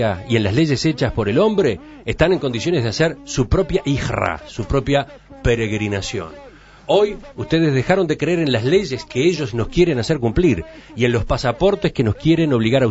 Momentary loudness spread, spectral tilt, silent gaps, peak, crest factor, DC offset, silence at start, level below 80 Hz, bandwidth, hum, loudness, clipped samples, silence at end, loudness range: 7 LU; -6 dB/octave; none; -2 dBFS; 16 dB; under 0.1%; 0 s; -34 dBFS; 8 kHz; none; -18 LUFS; under 0.1%; 0 s; 3 LU